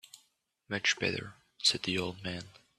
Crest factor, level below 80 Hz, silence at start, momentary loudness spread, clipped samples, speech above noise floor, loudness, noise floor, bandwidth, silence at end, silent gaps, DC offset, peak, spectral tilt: 24 dB; -68 dBFS; 0.15 s; 12 LU; under 0.1%; 40 dB; -32 LUFS; -74 dBFS; 14 kHz; 0.2 s; none; under 0.1%; -12 dBFS; -2.5 dB/octave